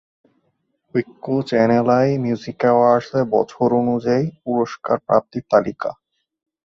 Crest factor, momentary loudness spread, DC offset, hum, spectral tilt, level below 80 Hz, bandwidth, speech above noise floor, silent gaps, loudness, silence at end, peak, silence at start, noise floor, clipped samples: 18 dB; 9 LU; under 0.1%; none; -8 dB/octave; -60 dBFS; 7.4 kHz; 51 dB; none; -19 LUFS; 0.75 s; -2 dBFS; 0.95 s; -69 dBFS; under 0.1%